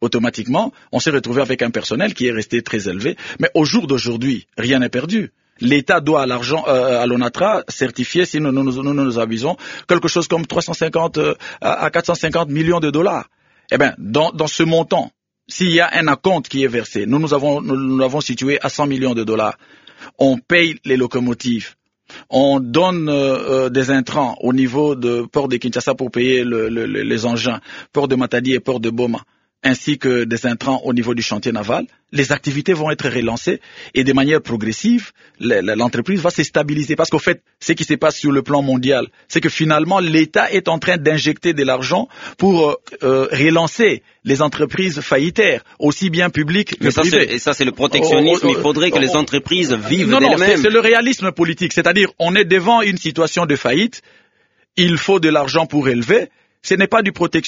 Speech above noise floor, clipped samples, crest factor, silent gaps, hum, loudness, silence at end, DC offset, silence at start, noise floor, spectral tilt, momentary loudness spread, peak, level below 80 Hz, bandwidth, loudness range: 44 dB; under 0.1%; 16 dB; none; none; -16 LUFS; 0 s; under 0.1%; 0 s; -60 dBFS; -4 dB/octave; 7 LU; 0 dBFS; -52 dBFS; 7.6 kHz; 5 LU